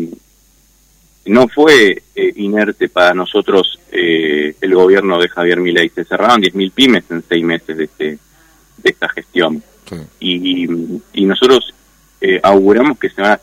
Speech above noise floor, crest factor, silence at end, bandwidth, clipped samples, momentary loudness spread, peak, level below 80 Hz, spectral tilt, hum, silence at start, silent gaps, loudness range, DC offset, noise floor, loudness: 38 dB; 12 dB; 0.05 s; 15.5 kHz; 0.2%; 13 LU; 0 dBFS; -52 dBFS; -4.5 dB/octave; none; 0 s; none; 6 LU; under 0.1%; -50 dBFS; -12 LUFS